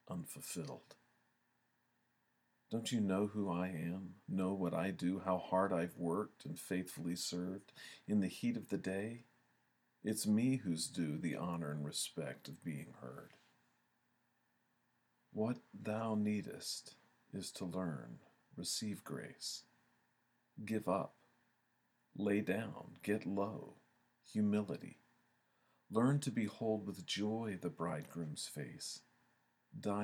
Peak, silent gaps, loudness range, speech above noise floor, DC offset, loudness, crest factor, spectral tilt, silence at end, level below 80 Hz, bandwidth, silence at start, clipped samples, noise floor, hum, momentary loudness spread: -20 dBFS; none; 6 LU; 40 dB; under 0.1%; -41 LUFS; 22 dB; -5.5 dB/octave; 0 s; -82 dBFS; 19 kHz; 0.1 s; under 0.1%; -80 dBFS; none; 13 LU